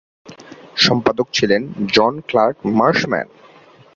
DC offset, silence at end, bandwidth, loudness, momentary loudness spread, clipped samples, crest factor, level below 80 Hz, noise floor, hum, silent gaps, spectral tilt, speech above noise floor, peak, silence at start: under 0.1%; 0.7 s; 7.6 kHz; -16 LUFS; 8 LU; under 0.1%; 18 dB; -54 dBFS; -39 dBFS; none; none; -4.5 dB/octave; 23 dB; 0 dBFS; 0.25 s